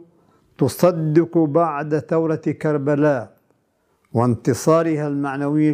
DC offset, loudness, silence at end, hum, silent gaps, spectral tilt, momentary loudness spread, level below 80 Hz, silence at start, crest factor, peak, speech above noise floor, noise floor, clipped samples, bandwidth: under 0.1%; -19 LUFS; 0 s; none; none; -7.5 dB/octave; 6 LU; -64 dBFS; 0.6 s; 18 dB; -2 dBFS; 47 dB; -65 dBFS; under 0.1%; 16 kHz